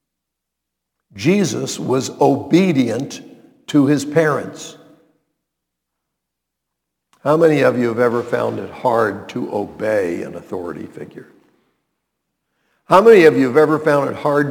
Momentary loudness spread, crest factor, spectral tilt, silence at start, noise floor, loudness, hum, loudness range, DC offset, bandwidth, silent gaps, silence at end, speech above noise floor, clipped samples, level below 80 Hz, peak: 17 LU; 18 dB; -6 dB/octave; 1.15 s; -80 dBFS; -16 LUFS; none; 10 LU; under 0.1%; 18 kHz; none; 0 s; 65 dB; under 0.1%; -62 dBFS; 0 dBFS